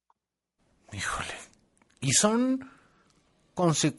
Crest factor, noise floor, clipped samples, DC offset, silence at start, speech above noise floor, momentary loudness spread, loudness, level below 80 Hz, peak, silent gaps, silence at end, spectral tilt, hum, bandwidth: 20 dB; -80 dBFS; under 0.1%; under 0.1%; 0.9 s; 54 dB; 19 LU; -27 LUFS; -60 dBFS; -10 dBFS; none; 0.05 s; -3.5 dB/octave; none; 11.5 kHz